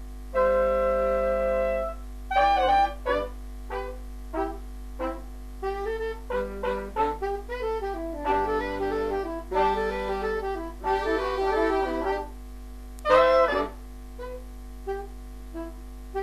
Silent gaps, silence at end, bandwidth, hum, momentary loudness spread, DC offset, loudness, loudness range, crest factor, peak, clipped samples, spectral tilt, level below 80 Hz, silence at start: none; 0 s; 14 kHz; 50 Hz at -40 dBFS; 18 LU; 0.2%; -27 LUFS; 7 LU; 22 dB; -6 dBFS; under 0.1%; -5.5 dB/octave; -40 dBFS; 0 s